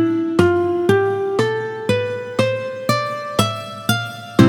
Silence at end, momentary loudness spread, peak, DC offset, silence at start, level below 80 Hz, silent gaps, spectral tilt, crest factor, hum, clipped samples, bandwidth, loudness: 0 s; 6 LU; 0 dBFS; under 0.1%; 0 s; -52 dBFS; none; -6 dB/octave; 18 dB; none; under 0.1%; 19.5 kHz; -19 LUFS